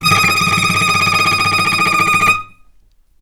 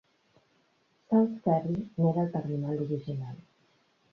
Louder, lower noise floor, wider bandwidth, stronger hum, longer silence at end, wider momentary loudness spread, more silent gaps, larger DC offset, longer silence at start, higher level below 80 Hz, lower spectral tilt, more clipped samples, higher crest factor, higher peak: first, -12 LUFS vs -30 LUFS; second, -50 dBFS vs -70 dBFS; first, 20 kHz vs 5.8 kHz; neither; about the same, 0.75 s vs 0.75 s; second, 2 LU vs 12 LU; neither; neither; second, 0 s vs 1.1 s; first, -44 dBFS vs -68 dBFS; second, -2.5 dB/octave vs -11 dB/octave; neither; second, 14 dB vs 20 dB; first, 0 dBFS vs -12 dBFS